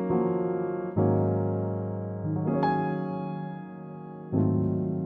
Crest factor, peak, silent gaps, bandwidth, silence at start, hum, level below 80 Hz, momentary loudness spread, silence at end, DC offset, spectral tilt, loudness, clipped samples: 16 dB; -12 dBFS; none; 4.5 kHz; 0 s; none; -60 dBFS; 13 LU; 0 s; under 0.1%; -12 dB/octave; -28 LUFS; under 0.1%